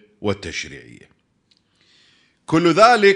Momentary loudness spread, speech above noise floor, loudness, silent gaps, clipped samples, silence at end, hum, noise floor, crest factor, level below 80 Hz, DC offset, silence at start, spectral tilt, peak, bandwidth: 20 LU; 47 dB; -17 LUFS; none; under 0.1%; 0 s; none; -63 dBFS; 18 dB; -54 dBFS; under 0.1%; 0.2 s; -5 dB/octave; 0 dBFS; 10.5 kHz